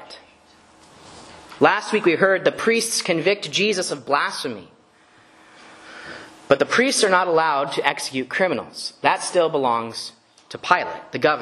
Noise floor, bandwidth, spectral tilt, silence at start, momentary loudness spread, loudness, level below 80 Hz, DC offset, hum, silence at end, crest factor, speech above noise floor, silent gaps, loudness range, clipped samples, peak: -54 dBFS; 13 kHz; -3 dB/octave; 0 s; 20 LU; -20 LUFS; -66 dBFS; under 0.1%; none; 0 s; 22 dB; 33 dB; none; 4 LU; under 0.1%; 0 dBFS